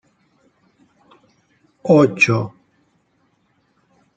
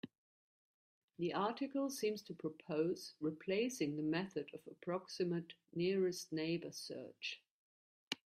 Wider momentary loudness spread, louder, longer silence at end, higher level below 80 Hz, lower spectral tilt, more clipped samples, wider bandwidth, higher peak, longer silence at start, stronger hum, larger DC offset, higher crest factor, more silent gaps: first, 17 LU vs 9 LU; first, -16 LUFS vs -41 LUFS; first, 1.7 s vs 0.15 s; first, -62 dBFS vs -84 dBFS; first, -6.5 dB/octave vs -5 dB/octave; neither; second, 9 kHz vs 15 kHz; first, -2 dBFS vs -22 dBFS; first, 1.85 s vs 0.05 s; neither; neither; about the same, 20 dB vs 22 dB; second, none vs 0.18-1.08 s, 7.50-8.11 s